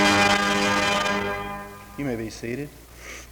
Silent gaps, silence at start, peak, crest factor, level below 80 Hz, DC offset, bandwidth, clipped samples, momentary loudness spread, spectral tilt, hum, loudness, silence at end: none; 0 s; -8 dBFS; 16 dB; -48 dBFS; under 0.1%; over 20 kHz; under 0.1%; 20 LU; -3 dB/octave; none; -23 LUFS; 0 s